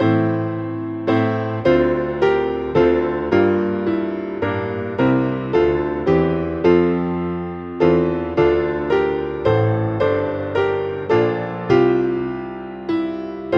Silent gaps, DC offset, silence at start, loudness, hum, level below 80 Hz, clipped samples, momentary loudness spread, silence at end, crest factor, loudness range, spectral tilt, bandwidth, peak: none; under 0.1%; 0 s; -19 LUFS; none; -44 dBFS; under 0.1%; 8 LU; 0 s; 16 dB; 1 LU; -9 dB/octave; 6.2 kHz; -2 dBFS